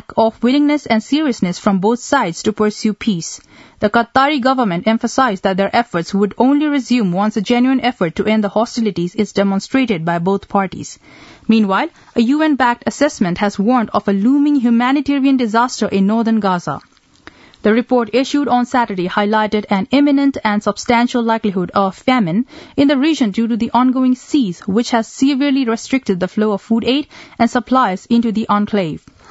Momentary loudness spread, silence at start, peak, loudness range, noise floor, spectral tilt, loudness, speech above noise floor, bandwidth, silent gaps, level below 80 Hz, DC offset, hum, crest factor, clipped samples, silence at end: 5 LU; 0.1 s; 0 dBFS; 2 LU; -43 dBFS; -5.5 dB/octave; -15 LUFS; 28 dB; 8 kHz; none; -52 dBFS; under 0.1%; none; 16 dB; under 0.1%; 0.35 s